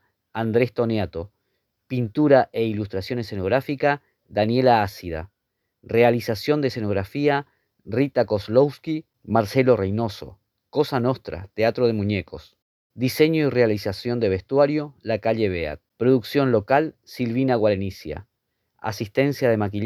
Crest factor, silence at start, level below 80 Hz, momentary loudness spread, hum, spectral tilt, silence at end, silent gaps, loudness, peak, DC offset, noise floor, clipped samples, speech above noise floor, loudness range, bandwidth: 20 dB; 0.35 s; -52 dBFS; 12 LU; none; -7 dB/octave; 0 s; 12.62-12.90 s; -22 LUFS; -2 dBFS; under 0.1%; -78 dBFS; under 0.1%; 56 dB; 2 LU; 14.5 kHz